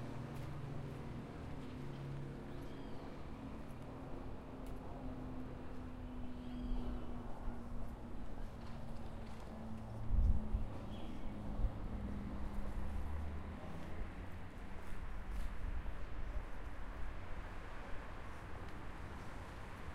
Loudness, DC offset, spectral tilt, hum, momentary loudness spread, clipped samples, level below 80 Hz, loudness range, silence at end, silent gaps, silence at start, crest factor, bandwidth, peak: -48 LUFS; under 0.1%; -7.5 dB/octave; none; 7 LU; under 0.1%; -46 dBFS; 6 LU; 0 s; none; 0 s; 22 dB; 12 kHz; -20 dBFS